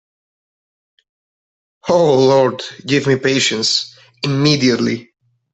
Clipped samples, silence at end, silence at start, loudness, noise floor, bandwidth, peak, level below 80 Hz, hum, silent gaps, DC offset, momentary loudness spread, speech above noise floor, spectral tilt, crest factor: under 0.1%; 0.5 s; 1.85 s; -15 LUFS; under -90 dBFS; 8.4 kHz; -2 dBFS; -58 dBFS; none; none; under 0.1%; 14 LU; over 76 dB; -4.5 dB/octave; 14 dB